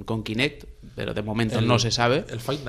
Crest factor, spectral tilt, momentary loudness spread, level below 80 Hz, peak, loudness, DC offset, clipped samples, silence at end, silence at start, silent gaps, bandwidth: 18 dB; -5 dB/octave; 10 LU; -46 dBFS; -6 dBFS; -24 LUFS; under 0.1%; under 0.1%; 0 s; 0 s; none; 14.5 kHz